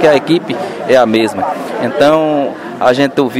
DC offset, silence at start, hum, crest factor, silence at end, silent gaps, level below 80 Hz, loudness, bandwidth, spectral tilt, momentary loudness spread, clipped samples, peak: under 0.1%; 0 s; none; 12 dB; 0 s; none; -52 dBFS; -12 LUFS; 16 kHz; -5.5 dB/octave; 8 LU; 0.3%; 0 dBFS